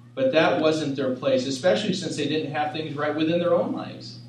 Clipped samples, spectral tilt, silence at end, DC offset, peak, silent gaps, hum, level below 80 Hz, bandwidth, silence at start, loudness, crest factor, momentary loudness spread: under 0.1%; -5.5 dB/octave; 0 s; under 0.1%; -4 dBFS; none; none; -70 dBFS; 10.5 kHz; 0.05 s; -24 LUFS; 20 dB; 7 LU